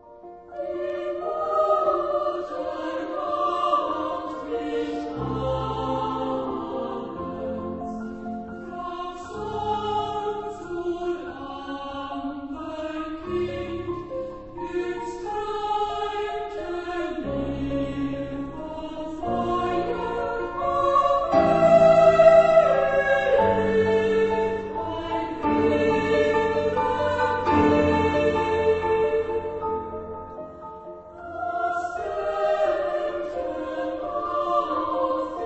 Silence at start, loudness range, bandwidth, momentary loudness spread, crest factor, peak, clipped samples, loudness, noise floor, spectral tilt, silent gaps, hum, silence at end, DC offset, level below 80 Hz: 0.05 s; 13 LU; 8.4 kHz; 14 LU; 22 dB; -2 dBFS; under 0.1%; -24 LUFS; -44 dBFS; -6.5 dB/octave; none; none; 0 s; under 0.1%; -48 dBFS